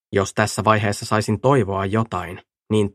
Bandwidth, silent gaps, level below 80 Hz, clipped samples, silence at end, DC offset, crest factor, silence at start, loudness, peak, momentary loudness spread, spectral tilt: 14.5 kHz; none; -52 dBFS; under 0.1%; 0.05 s; under 0.1%; 20 dB; 0.1 s; -20 LUFS; 0 dBFS; 10 LU; -5.5 dB/octave